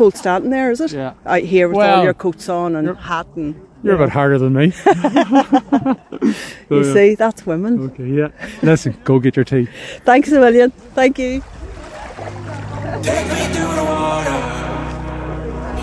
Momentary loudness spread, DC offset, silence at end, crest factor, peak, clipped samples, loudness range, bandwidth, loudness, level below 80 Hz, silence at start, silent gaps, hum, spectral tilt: 14 LU; under 0.1%; 0 s; 14 dB; 0 dBFS; under 0.1%; 6 LU; 11 kHz; -16 LUFS; -38 dBFS; 0 s; none; none; -6.5 dB/octave